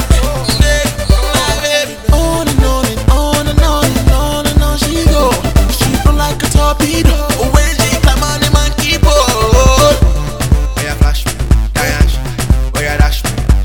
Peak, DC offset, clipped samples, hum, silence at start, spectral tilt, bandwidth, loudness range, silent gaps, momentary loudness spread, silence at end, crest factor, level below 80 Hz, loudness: 0 dBFS; 0.4%; 0.7%; none; 0 s; -4.5 dB/octave; 19 kHz; 2 LU; none; 4 LU; 0 s; 10 dB; -12 dBFS; -12 LUFS